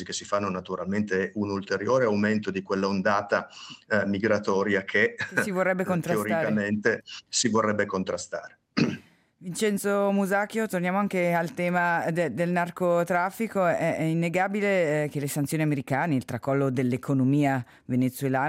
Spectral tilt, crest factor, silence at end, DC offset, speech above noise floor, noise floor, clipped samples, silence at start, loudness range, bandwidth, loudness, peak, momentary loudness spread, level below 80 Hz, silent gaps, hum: -5.5 dB/octave; 16 dB; 0 s; under 0.1%; 22 dB; -48 dBFS; under 0.1%; 0 s; 2 LU; 16 kHz; -26 LUFS; -10 dBFS; 6 LU; -70 dBFS; none; none